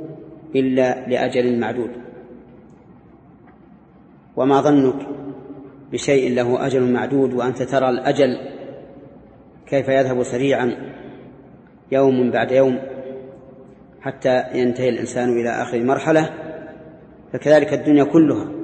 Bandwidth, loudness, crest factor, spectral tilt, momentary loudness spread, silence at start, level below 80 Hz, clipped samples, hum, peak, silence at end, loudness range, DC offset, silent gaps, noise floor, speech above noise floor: 8.8 kHz; -18 LUFS; 18 dB; -6.5 dB/octave; 20 LU; 0 s; -56 dBFS; under 0.1%; none; -2 dBFS; 0 s; 4 LU; under 0.1%; none; -47 dBFS; 30 dB